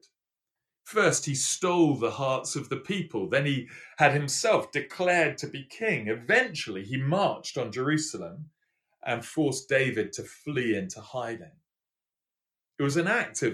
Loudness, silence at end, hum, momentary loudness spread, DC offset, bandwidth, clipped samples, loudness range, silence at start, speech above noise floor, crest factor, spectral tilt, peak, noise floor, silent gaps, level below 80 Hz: -27 LUFS; 0 s; none; 12 LU; under 0.1%; 13.5 kHz; under 0.1%; 5 LU; 0.85 s; over 62 dB; 22 dB; -4 dB/octave; -8 dBFS; under -90 dBFS; none; -72 dBFS